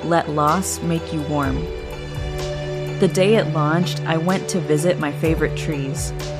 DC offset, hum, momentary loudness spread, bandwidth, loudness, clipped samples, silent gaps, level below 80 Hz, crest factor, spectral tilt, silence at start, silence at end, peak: under 0.1%; none; 9 LU; 15.5 kHz; -21 LUFS; under 0.1%; none; -36 dBFS; 18 dB; -5.5 dB/octave; 0 s; 0 s; -2 dBFS